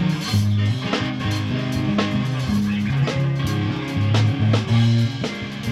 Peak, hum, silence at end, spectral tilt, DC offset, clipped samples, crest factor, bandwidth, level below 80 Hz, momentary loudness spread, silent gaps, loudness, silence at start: -6 dBFS; none; 0 s; -6.5 dB/octave; under 0.1%; under 0.1%; 14 dB; 13 kHz; -42 dBFS; 5 LU; none; -21 LUFS; 0 s